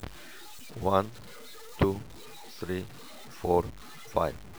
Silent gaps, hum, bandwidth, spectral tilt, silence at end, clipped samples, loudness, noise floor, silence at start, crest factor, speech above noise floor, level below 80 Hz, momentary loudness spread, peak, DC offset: none; none; over 20 kHz; -6.5 dB/octave; 0 s; under 0.1%; -31 LUFS; -48 dBFS; 0 s; 24 dB; 18 dB; -48 dBFS; 19 LU; -10 dBFS; 0.4%